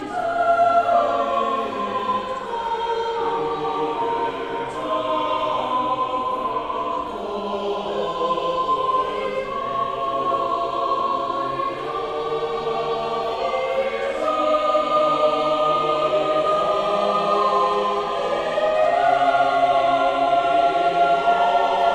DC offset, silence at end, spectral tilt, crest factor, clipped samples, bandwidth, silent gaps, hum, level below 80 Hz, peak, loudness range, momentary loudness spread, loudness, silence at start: under 0.1%; 0 s; -4.5 dB/octave; 14 dB; under 0.1%; 10 kHz; none; none; -52 dBFS; -6 dBFS; 5 LU; 7 LU; -21 LUFS; 0 s